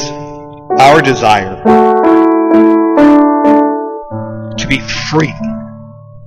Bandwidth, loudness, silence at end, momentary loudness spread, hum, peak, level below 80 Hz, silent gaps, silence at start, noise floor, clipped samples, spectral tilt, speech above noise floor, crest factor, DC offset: 11 kHz; -9 LUFS; 0 s; 16 LU; none; 0 dBFS; -38 dBFS; none; 0 s; -32 dBFS; under 0.1%; -5.5 dB/octave; 22 dB; 10 dB; under 0.1%